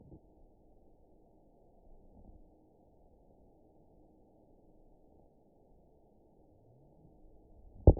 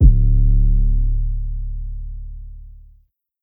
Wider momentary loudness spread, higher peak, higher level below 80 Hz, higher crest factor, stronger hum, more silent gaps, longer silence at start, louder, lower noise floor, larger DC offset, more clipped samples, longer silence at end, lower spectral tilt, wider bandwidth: second, 6 LU vs 20 LU; second, -8 dBFS vs 0 dBFS; second, -42 dBFS vs -16 dBFS; first, 30 dB vs 16 dB; neither; neither; first, 7.85 s vs 0 s; second, -29 LUFS vs -21 LUFS; first, -65 dBFS vs -55 dBFS; neither; neither; second, 0.05 s vs 0.7 s; second, -5 dB/octave vs -14 dB/octave; first, 1 kHz vs 0.6 kHz